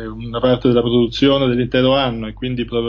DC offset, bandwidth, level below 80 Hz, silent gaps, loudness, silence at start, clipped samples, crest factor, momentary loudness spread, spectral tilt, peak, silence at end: under 0.1%; 7.2 kHz; -38 dBFS; none; -16 LUFS; 0 s; under 0.1%; 14 dB; 9 LU; -7.5 dB/octave; -2 dBFS; 0 s